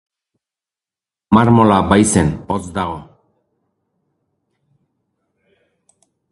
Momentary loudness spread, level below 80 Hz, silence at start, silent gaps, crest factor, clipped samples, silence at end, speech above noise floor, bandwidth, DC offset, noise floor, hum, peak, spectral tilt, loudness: 12 LU; -40 dBFS; 1.3 s; none; 18 dB; under 0.1%; 3.3 s; 76 dB; 11.5 kHz; under 0.1%; -89 dBFS; none; 0 dBFS; -6 dB/octave; -14 LUFS